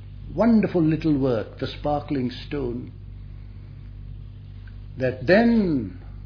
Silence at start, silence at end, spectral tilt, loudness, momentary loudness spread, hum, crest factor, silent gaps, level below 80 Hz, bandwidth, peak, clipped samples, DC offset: 0 s; 0 s; -9 dB/octave; -23 LUFS; 22 LU; none; 20 dB; none; -42 dBFS; 5.4 kHz; -4 dBFS; under 0.1%; under 0.1%